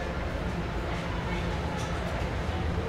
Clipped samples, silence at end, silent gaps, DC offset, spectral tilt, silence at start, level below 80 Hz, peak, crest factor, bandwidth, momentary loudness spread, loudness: under 0.1%; 0 s; none; under 0.1%; -6 dB/octave; 0 s; -36 dBFS; -18 dBFS; 14 dB; 14 kHz; 1 LU; -32 LUFS